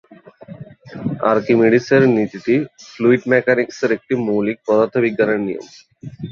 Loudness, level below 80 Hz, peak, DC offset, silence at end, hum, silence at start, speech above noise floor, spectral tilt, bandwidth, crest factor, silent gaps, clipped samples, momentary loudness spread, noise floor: -17 LUFS; -58 dBFS; -2 dBFS; under 0.1%; 0 s; none; 0.4 s; 22 dB; -7 dB/octave; 7.2 kHz; 16 dB; none; under 0.1%; 21 LU; -39 dBFS